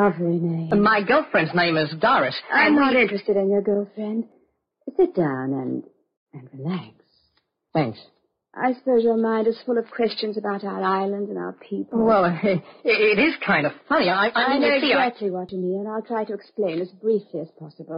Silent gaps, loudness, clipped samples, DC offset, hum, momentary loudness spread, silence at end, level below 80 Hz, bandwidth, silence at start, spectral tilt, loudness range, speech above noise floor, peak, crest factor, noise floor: 6.17-6.26 s; -22 LUFS; under 0.1%; under 0.1%; none; 12 LU; 0 s; -62 dBFS; 5.4 kHz; 0 s; -8.5 dB/octave; 8 LU; 48 dB; -8 dBFS; 14 dB; -69 dBFS